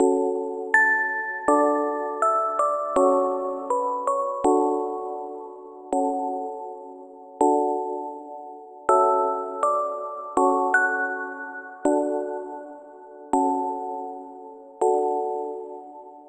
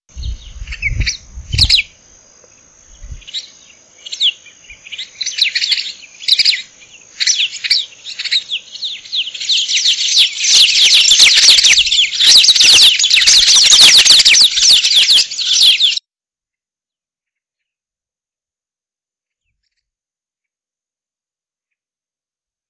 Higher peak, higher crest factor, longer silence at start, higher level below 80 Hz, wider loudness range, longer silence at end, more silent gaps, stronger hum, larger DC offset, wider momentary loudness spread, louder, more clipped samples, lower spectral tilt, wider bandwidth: second, -6 dBFS vs 0 dBFS; about the same, 18 dB vs 14 dB; second, 0 s vs 0.15 s; second, -66 dBFS vs -34 dBFS; second, 6 LU vs 13 LU; second, 0 s vs 6.7 s; neither; neither; neither; about the same, 19 LU vs 21 LU; second, -24 LUFS vs -7 LUFS; neither; first, -4.5 dB/octave vs 2 dB/octave; second, 9.4 kHz vs 11 kHz